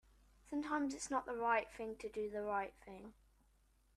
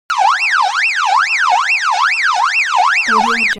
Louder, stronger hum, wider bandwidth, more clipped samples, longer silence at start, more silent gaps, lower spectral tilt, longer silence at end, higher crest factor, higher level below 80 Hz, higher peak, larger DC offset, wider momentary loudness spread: second, -41 LUFS vs -12 LUFS; neither; about the same, 13 kHz vs 13.5 kHz; neither; first, 0.45 s vs 0.1 s; neither; first, -4 dB/octave vs 0 dB/octave; first, 0.85 s vs 0 s; first, 20 dB vs 12 dB; second, -68 dBFS vs -56 dBFS; second, -24 dBFS vs -2 dBFS; neither; first, 19 LU vs 1 LU